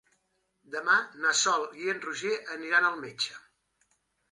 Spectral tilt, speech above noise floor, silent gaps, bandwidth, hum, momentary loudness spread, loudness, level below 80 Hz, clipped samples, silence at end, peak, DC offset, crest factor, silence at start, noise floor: -0.5 dB/octave; 46 dB; none; 11.5 kHz; none; 9 LU; -28 LUFS; -82 dBFS; under 0.1%; 0.95 s; -10 dBFS; under 0.1%; 20 dB; 0.7 s; -75 dBFS